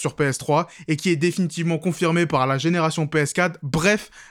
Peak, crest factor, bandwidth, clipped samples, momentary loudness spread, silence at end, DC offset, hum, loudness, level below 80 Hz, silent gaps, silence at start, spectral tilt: -6 dBFS; 16 dB; 16 kHz; under 0.1%; 4 LU; 0.05 s; under 0.1%; none; -21 LUFS; -52 dBFS; none; 0 s; -5.5 dB/octave